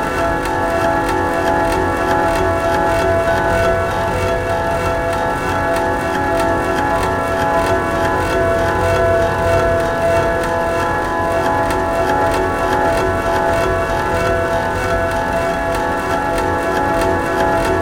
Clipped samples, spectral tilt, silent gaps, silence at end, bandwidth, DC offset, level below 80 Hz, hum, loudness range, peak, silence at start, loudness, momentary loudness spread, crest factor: under 0.1%; -5.5 dB/octave; none; 0 s; 17 kHz; 0.4%; -30 dBFS; none; 1 LU; -2 dBFS; 0 s; -16 LUFS; 3 LU; 14 dB